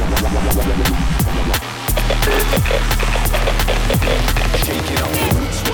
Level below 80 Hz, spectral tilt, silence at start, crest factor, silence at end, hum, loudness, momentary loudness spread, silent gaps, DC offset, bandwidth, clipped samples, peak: -18 dBFS; -4.5 dB/octave; 0 s; 12 dB; 0 s; none; -17 LUFS; 2 LU; none; under 0.1%; over 20 kHz; under 0.1%; -4 dBFS